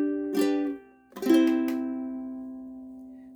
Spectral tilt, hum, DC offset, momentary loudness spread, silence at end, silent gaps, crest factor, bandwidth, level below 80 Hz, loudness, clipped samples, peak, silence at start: -5 dB/octave; none; under 0.1%; 21 LU; 0 s; none; 18 dB; over 20 kHz; -68 dBFS; -27 LUFS; under 0.1%; -10 dBFS; 0 s